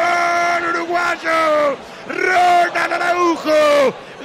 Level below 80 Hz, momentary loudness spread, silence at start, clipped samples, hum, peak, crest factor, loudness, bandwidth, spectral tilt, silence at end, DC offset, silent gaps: -58 dBFS; 7 LU; 0 s; under 0.1%; none; -6 dBFS; 10 dB; -16 LUFS; 16 kHz; -3 dB/octave; 0 s; under 0.1%; none